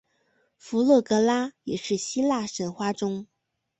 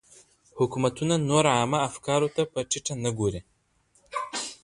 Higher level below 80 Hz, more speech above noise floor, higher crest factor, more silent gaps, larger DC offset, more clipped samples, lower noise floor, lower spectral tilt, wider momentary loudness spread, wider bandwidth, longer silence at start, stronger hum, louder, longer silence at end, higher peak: second, -68 dBFS vs -56 dBFS; first, 45 dB vs 41 dB; about the same, 18 dB vs 20 dB; neither; neither; neither; about the same, -69 dBFS vs -66 dBFS; about the same, -4.5 dB/octave vs -4.5 dB/octave; about the same, 11 LU vs 11 LU; second, 8.4 kHz vs 11.5 kHz; about the same, 0.65 s vs 0.55 s; neither; about the same, -25 LUFS vs -26 LUFS; first, 0.55 s vs 0.1 s; about the same, -8 dBFS vs -6 dBFS